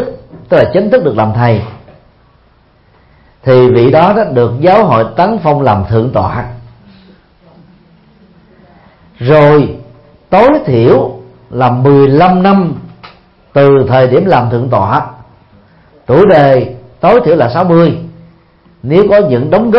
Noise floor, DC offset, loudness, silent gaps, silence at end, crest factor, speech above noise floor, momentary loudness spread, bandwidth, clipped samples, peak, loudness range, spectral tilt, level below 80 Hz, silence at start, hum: -47 dBFS; under 0.1%; -8 LUFS; none; 0 s; 10 dB; 40 dB; 13 LU; 5.8 kHz; 0.3%; 0 dBFS; 5 LU; -10 dB/octave; -40 dBFS; 0 s; none